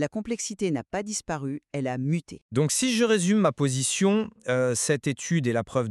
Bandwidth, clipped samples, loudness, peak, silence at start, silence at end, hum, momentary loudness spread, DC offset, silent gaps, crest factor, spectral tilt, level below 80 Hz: 13 kHz; under 0.1%; -26 LUFS; -10 dBFS; 0 s; 0 s; none; 9 LU; under 0.1%; 2.42-2.49 s; 16 dB; -4.5 dB/octave; -62 dBFS